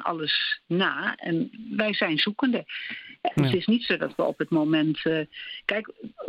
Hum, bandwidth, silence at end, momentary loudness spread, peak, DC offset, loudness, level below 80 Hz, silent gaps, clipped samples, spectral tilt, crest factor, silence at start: none; 10.5 kHz; 0 s; 8 LU; -8 dBFS; under 0.1%; -26 LUFS; -64 dBFS; none; under 0.1%; -7 dB/octave; 18 dB; 0 s